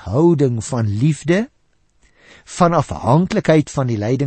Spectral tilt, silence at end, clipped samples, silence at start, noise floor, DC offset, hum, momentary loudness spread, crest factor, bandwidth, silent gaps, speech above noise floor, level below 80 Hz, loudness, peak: -7 dB/octave; 0 s; under 0.1%; 0 s; -61 dBFS; under 0.1%; none; 6 LU; 16 dB; 8.8 kHz; none; 44 dB; -44 dBFS; -17 LUFS; -2 dBFS